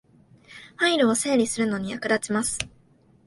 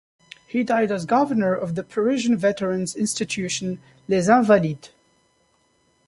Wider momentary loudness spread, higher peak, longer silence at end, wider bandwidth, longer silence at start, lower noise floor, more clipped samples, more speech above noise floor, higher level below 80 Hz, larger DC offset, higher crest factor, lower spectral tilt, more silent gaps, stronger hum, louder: first, 13 LU vs 10 LU; about the same, -4 dBFS vs -4 dBFS; second, 0.6 s vs 1.2 s; about the same, 12 kHz vs 11.5 kHz; about the same, 0.5 s vs 0.55 s; second, -58 dBFS vs -64 dBFS; neither; second, 34 dB vs 43 dB; about the same, -58 dBFS vs -60 dBFS; neither; about the same, 22 dB vs 20 dB; second, -3 dB/octave vs -5 dB/octave; neither; neither; about the same, -24 LUFS vs -22 LUFS